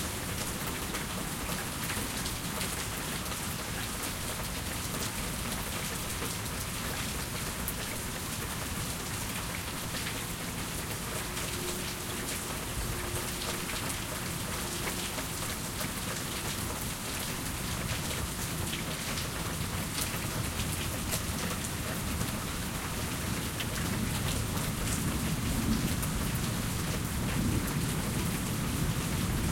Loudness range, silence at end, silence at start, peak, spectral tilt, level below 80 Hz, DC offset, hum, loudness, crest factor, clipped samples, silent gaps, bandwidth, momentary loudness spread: 3 LU; 0 s; 0 s; -12 dBFS; -3.5 dB/octave; -44 dBFS; under 0.1%; none; -33 LUFS; 20 dB; under 0.1%; none; 17 kHz; 3 LU